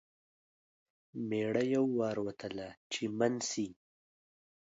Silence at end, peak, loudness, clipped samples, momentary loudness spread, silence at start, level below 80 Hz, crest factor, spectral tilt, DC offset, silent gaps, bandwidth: 0.95 s; -16 dBFS; -35 LUFS; under 0.1%; 12 LU; 1.15 s; -74 dBFS; 20 dB; -4.5 dB/octave; under 0.1%; 2.77-2.90 s; 8 kHz